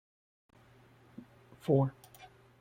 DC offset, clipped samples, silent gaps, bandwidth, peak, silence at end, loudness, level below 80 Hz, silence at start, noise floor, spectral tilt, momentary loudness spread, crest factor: under 0.1%; under 0.1%; none; 16 kHz; -16 dBFS; 0.35 s; -32 LUFS; -70 dBFS; 1.65 s; -61 dBFS; -9 dB/octave; 25 LU; 22 dB